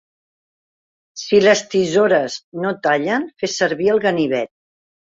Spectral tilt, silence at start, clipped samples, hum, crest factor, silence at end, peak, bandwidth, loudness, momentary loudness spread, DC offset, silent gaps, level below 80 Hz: -4 dB/octave; 1.15 s; under 0.1%; none; 16 dB; 0.6 s; -2 dBFS; 7.8 kHz; -17 LUFS; 11 LU; under 0.1%; 2.44-2.52 s; -62 dBFS